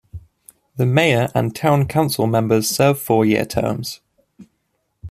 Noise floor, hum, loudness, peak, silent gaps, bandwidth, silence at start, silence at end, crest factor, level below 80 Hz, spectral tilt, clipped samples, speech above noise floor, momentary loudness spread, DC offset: -70 dBFS; none; -18 LUFS; -2 dBFS; none; 15.5 kHz; 0.15 s; 0 s; 16 dB; -50 dBFS; -5.5 dB/octave; under 0.1%; 53 dB; 10 LU; under 0.1%